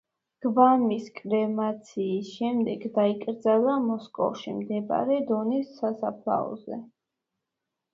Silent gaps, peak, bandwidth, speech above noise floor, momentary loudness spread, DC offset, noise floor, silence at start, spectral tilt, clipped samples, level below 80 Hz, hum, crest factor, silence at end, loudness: none; -6 dBFS; 7.6 kHz; 59 dB; 11 LU; under 0.1%; -85 dBFS; 0.4 s; -7.5 dB/octave; under 0.1%; -74 dBFS; none; 20 dB; 1.1 s; -27 LUFS